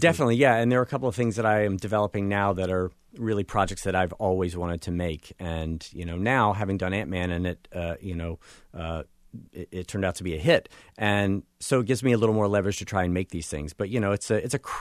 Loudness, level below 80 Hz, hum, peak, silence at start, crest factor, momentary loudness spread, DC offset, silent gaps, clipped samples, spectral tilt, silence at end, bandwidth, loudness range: -26 LUFS; -46 dBFS; none; -6 dBFS; 0 s; 20 dB; 12 LU; under 0.1%; none; under 0.1%; -6 dB/octave; 0 s; 13.5 kHz; 5 LU